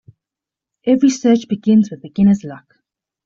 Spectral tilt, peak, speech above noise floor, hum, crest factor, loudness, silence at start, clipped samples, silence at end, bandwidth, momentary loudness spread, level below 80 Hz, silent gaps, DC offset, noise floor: -7 dB/octave; -2 dBFS; 72 dB; none; 14 dB; -15 LUFS; 0.85 s; under 0.1%; 0.7 s; 7.6 kHz; 9 LU; -54 dBFS; none; under 0.1%; -86 dBFS